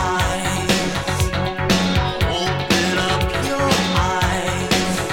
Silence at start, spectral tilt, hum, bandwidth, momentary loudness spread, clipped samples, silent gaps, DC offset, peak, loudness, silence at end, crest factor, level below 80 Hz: 0 s; -4 dB/octave; none; 18 kHz; 4 LU; under 0.1%; none; under 0.1%; -2 dBFS; -19 LUFS; 0 s; 18 dB; -30 dBFS